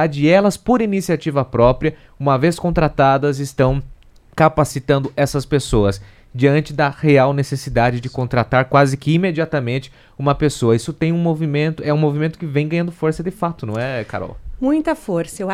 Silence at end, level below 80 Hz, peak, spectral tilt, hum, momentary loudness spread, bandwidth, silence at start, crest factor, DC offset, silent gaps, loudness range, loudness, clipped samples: 0 s; -36 dBFS; 0 dBFS; -6.5 dB/octave; none; 9 LU; 14.5 kHz; 0 s; 16 dB; under 0.1%; none; 4 LU; -18 LUFS; under 0.1%